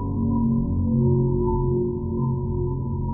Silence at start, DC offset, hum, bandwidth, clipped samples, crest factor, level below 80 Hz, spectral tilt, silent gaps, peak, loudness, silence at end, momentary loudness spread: 0 s; under 0.1%; none; 1.2 kHz; under 0.1%; 12 dB; -34 dBFS; -17.5 dB/octave; none; -10 dBFS; -23 LUFS; 0 s; 6 LU